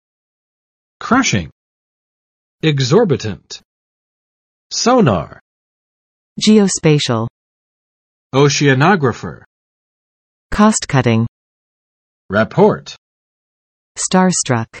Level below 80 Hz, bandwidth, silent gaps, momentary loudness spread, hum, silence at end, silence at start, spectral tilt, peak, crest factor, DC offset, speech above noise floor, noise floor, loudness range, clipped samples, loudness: -44 dBFS; 8.8 kHz; 1.52-2.58 s, 3.65-4.70 s, 5.41-6.36 s, 7.30-8.30 s, 9.46-10.50 s, 11.28-12.29 s, 12.98-13.95 s; 19 LU; none; 0 s; 1 s; -5 dB/octave; 0 dBFS; 16 dB; under 0.1%; over 77 dB; under -90 dBFS; 4 LU; under 0.1%; -14 LUFS